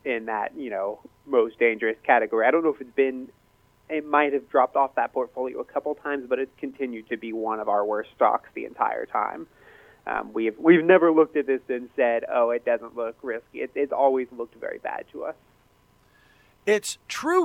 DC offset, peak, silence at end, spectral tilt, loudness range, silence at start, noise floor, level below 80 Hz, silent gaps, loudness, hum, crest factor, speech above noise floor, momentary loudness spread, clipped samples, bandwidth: under 0.1%; -4 dBFS; 0 s; -5 dB/octave; 7 LU; 0.05 s; -61 dBFS; -68 dBFS; none; -25 LUFS; none; 20 dB; 36 dB; 13 LU; under 0.1%; 15 kHz